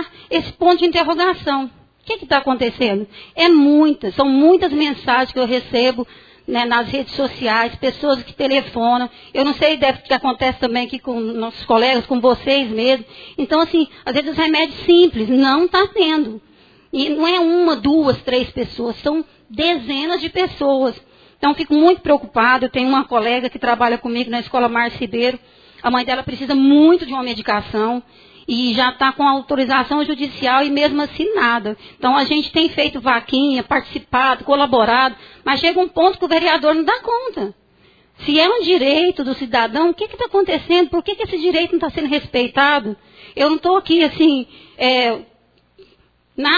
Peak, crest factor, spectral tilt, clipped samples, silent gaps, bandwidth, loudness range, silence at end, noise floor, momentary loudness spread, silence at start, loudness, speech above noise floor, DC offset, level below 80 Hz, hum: 0 dBFS; 16 dB; -5.5 dB/octave; under 0.1%; none; 5 kHz; 3 LU; 0 s; -56 dBFS; 9 LU; 0 s; -16 LUFS; 39 dB; under 0.1%; -48 dBFS; none